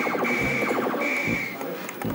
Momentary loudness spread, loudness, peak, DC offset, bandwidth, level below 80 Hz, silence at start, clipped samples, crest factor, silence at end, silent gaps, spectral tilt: 8 LU; -25 LUFS; -12 dBFS; under 0.1%; 17 kHz; -52 dBFS; 0 s; under 0.1%; 14 dB; 0 s; none; -5 dB/octave